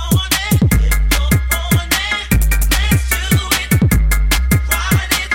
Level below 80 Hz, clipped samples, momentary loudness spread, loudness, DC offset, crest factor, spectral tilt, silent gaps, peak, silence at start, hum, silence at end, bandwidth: -18 dBFS; under 0.1%; 2 LU; -15 LUFS; under 0.1%; 12 dB; -4 dB/octave; none; 0 dBFS; 0 s; none; 0 s; 17 kHz